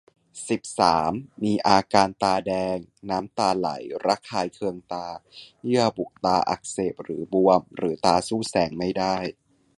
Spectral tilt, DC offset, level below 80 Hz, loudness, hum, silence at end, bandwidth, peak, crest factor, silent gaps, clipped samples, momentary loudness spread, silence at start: -5 dB/octave; under 0.1%; -56 dBFS; -24 LUFS; none; 0.45 s; 11.5 kHz; -2 dBFS; 24 dB; none; under 0.1%; 12 LU; 0.35 s